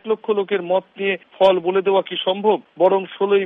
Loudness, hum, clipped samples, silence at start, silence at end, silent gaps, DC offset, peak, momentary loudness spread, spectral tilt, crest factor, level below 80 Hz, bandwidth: -19 LUFS; none; under 0.1%; 0.05 s; 0 s; none; under 0.1%; -4 dBFS; 6 LU; -7 dB/octave; 16 dB; -68 dBFS; 5.4 kHz